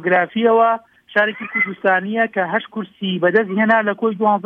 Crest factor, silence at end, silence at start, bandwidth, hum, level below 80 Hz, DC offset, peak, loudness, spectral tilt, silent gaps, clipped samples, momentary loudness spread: 16 dB; 0.05 s; 0 s; 4.8 kHz; none; -70 dBFS; under 0.1%; -2 dBFS; -17 LUFS; -8 dB/octave; none; under 0.1%; 7 LU